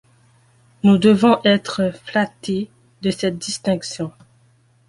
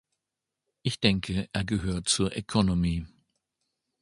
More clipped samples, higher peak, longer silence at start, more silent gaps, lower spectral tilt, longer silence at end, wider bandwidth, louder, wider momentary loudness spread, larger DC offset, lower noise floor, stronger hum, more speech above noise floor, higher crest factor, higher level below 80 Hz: neither; first, -2 dBFS vs -6 dBFS; about the same, 0.85 s vs 0.85 s; neither; about the same, -5.5 dB/octave vs -4.5 dB/octave; second, 0.8 s vs 0.95 s; about the same, 11.5 kHz vs 11.5 kHz; first, -19 LUFS vs -28 LUFS; first, 14 LU vs 9 LU; neither; second, -56 dBFS vs -87 dBFS; neither; second, 39 dB vs 60 dB; second, 18 dB vs 24 dB; second, -56 dBFS vs -44 dBFS